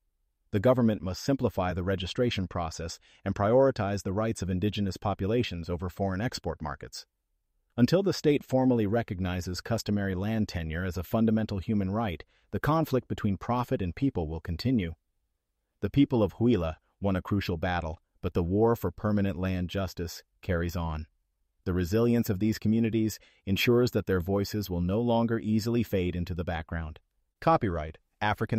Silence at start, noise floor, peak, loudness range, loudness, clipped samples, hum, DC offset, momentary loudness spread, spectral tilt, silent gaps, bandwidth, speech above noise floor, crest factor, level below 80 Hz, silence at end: 0.55 s; -80 dBFS; -12 dBFS; 3 LU; -29 LUFS; under 0.1%; none; under 0.1%; 11 LU; -7 dB/octave; none; 15.5 kHz; 52 dB; 18 dB; -48 dBFS; 0 s